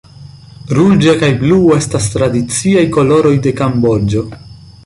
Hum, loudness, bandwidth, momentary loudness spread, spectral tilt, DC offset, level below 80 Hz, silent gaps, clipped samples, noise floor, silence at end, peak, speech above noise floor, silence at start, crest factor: none; -11 LUFS; 11.5 kHz; 7 LU; -6 dB/octave; under 0.1%; -36 dBFS; none; under 0.1%; -35 dBFS; 0.15 s; 0 dBFS; 24 dB; 0.2 s; 10 dB